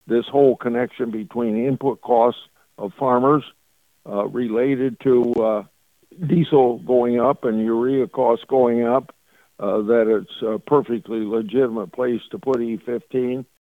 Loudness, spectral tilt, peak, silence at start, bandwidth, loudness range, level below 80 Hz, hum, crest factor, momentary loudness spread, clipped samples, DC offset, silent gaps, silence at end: -20 LUFS; -9 dB/octave; -4 dBFS; 0.05 s; 4.7 kHz; 3 LU; -62 dBFS; none; 16 dB; 9 LU; under 0.1%; under 0.1%; none; 0.3 s